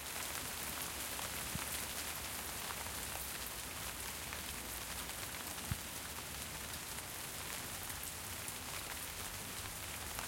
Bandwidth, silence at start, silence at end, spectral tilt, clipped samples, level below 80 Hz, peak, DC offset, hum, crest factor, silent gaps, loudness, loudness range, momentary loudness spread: 17 kHz; 0 s; 0 s; -1.5 dB/octave; under 0.1%; -58 dBFS; -24 dBFS; under 0.1%; none; 20 dB; none; -42 LUFS; 2 LU; 3 LU